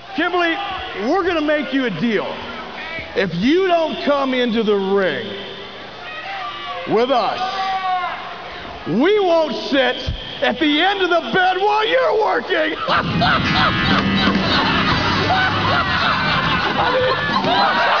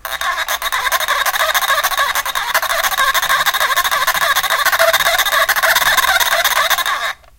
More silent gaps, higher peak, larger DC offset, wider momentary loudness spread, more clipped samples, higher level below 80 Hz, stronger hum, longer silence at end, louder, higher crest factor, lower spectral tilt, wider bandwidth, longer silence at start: neither; second, -4 dBFS vs 0 dBFS; first, 0.5% vs under 0.1%; first, 12 LU vs 6 LU; neither; about the same, -40 dBFS vs -44 dBFS; neither; second, 0 s vs 0.25 s; second, -17 LUFS vs -14 LUFS; about the same, 14 dB vs 16 dB; first, -5.5 dB/octave vs 1.5 dB/octave; second, 5.4 kHz vs 17.5 kHz; about the same, 0 s vs 0.05 s